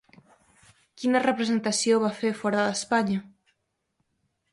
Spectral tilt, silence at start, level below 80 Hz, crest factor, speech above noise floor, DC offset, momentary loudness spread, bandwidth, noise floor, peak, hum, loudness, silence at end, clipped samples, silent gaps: -4 dB/octave; 1 s; -70 dBFS; 18 dB; 52 dB; under 0.1%; 6 LU; 11.5 kHz; -76 dBFS; -8 dBFS; none; -25 LUFS; 1.25 s; under 0.1%; none